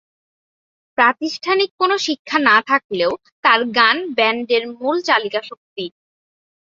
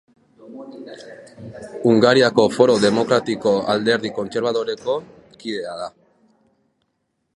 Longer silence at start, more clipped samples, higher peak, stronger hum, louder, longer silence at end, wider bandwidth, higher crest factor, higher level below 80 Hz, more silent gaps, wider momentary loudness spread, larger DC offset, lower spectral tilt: first, 1 s vs 0.45 s; neither; about the same, 0 dBFS vs 0 dBFS; neither; about the same, -17 LUFS vs -18 LUFS; second, 0.8 s vs 1.5 s; second, 7.8 kHz vs 11.5 kHz; about the same, 18 dB vs 20 dB; second, -68 dBFS vs -62 dBFS; first, 1.71-1.78 s, 2.19-2.25 s, 2.84-2.90 s, 3.32-3.43 s, 5.57-5.76 s vs none; second, 14 LU vs 23 LU; neither; second, -3 dB/octave vs -5 dB/octave